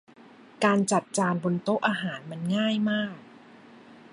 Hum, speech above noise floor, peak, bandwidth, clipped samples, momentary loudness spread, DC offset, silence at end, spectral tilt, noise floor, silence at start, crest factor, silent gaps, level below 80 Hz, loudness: none; 25 dB; -8 dBFS; 11.5 kHz; under 0.1%; 10 LU; under 0.1%; 0.15 s; -5 dB/octave; -51 dBFS; 0.6 s; 20 dB; none; -70 dBFS; -27 LUFS